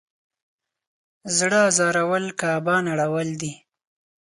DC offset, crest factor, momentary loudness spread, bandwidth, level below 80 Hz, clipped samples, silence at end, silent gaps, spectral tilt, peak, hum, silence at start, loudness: under 0.1%; 20 dB; 12 LU; 11.5 kHz; -68 dBFS; under 0.1%; 0.65 s; none; -3.5 dB/octave; -4 dBFS; none; 1.25 s; -21 LUFS